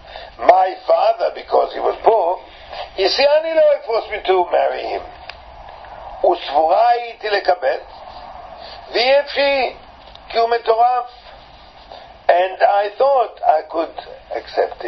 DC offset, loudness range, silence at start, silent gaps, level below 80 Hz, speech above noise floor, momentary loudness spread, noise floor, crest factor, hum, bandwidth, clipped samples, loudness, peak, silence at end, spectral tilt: under 0.1%; 3 LU; 0.05 s; none; -50 dBFS; 26 dB; 21 LU; -42 dBFS; 18 dB; none; 6.2 kHz; under 0.1%; -17 LUFS; 0 dBFS; 0 s; -4 dB/octave